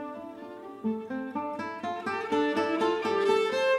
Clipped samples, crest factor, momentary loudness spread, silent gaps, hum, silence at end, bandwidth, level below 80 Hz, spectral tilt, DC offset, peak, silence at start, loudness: under 0.1%; 16 dB; 16 LU; none; none; 0 s; 12.5 kHz; -76 dBFS; -4.5 dB/octave; under 0.1%; -12 dBFS; 0 s; -29 LUFS